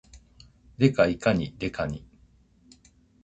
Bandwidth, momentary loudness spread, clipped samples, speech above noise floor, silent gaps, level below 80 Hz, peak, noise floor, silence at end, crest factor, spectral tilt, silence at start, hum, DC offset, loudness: 8.6 kHz; 11 LU; under 0.1%; 35 dB; none; -50 dBFS; -6 dBFS; -59 dBFS; 1.25 s; 24 dB; -7 dB/octave; 0.15 s; none; under 0.1%; -25 LUFS